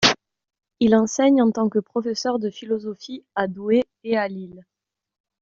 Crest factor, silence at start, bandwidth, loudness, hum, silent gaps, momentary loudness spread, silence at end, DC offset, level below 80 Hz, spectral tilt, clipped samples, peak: 20 dB; 0 s; 7.6 kHz; -22 LUFS; none; none; 13 LU; 0.8 s; under 0.1%; -60 dBFS; -3 dB/octave; under 0.1%; -2 dBFS